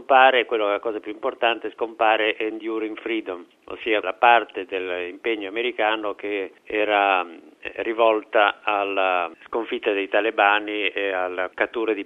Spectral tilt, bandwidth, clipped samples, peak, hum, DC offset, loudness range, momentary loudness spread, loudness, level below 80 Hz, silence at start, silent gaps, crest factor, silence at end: -4.5 dB/octave; 6.8 kHz; under 0.1%; -2 dBFS; none; under 0.1%; 3 LU; 11 LU; -22 LUFS; -68 dBFS; 0 s; none; 20 dB; 0 s